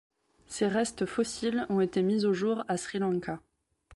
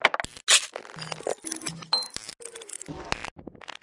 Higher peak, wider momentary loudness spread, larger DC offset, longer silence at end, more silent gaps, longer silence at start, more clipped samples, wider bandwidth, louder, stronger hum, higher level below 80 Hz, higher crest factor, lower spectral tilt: second, -16 dBFS vs -2 dBFS; second, 7 LU vs 20 LU; neither; about the same, 0 s vs 0.1 s; second, none vs 3.31-3.36 s; first, 0.5 s vs 0 s; neither; about the same, 11.5 kHz vs 11.5 kHz; second, -30 LUFS vs -26 LUFS; neither; second, -64 dBFS vs -58 dBFS; second, 14 dB vs 28 dB; first, -5.5 dB/octave vs -0.5 dB/octave